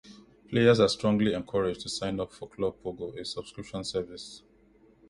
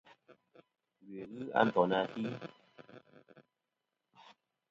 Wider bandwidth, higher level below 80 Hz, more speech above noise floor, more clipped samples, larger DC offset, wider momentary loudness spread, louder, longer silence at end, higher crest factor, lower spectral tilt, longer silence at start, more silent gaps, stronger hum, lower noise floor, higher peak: first, 11.5 kHz vs 7.6 kHz; first, -56 dBFS vs -80 dBFS; second, 32 dB vs 54 dB; neither; neither; second, 16 LU vs 28 LU; first, -29 LUFS vs -34 LUFS; second, 0.7 s vs 1.3 s; second, 22 dB vs 28 dB; first, -5.5 dB/octave vs -4 dB/octave; second, 0.05 s vs 0.3 s; neither; neither; second, -60 dBFS vs -88 dBFS; first, -8 dBFS vs -12 dBFS